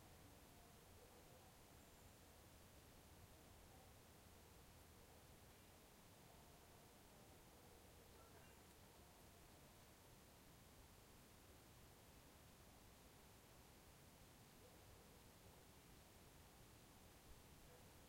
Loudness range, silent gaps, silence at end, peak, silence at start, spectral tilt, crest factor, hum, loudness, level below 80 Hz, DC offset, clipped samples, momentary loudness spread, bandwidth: 0 LU; none; 0 s; -52 dBFS; 0 s; -4 dB/octave; 16 dB; none; -67 LUFS; -74 dBFS; under 0.1%; under 0.1%; 1 LU; 16.5 kHz